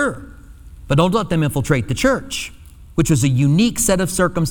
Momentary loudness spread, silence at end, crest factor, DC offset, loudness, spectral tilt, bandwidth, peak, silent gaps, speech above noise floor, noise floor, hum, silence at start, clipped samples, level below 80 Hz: 11 LU; 0 s; 16 dB; under 0.1%; -18 LUFS; -5 dB/octave; 19 kHz; -2 dBFS; none; 22 dB; -39 dBFS; none; 0 s; under 0.1%; -36 dBFS